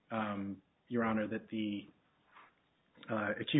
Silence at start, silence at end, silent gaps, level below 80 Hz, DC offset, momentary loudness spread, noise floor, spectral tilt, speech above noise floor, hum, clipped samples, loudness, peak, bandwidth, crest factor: 0.1 s; 0 s; none; -72 dBFS; under 0.1%; 11 LU; -72 dBFS; -3.5 dB/octave; 36 dB; none; under 0.1%; -38 LUFS; -20 dBFS; 3.9 kHz; 18 dB